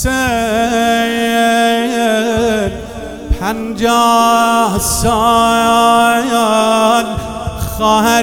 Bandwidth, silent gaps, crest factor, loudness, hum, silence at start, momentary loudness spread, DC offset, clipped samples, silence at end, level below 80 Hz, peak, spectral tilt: 18 kHz; none; 12 dB; -12 LUFS; none; 0 s; 11 LU; 0.3%; under 0.1%; 0 s; -30 dBFS; 0 dBFS; -4 dB/octave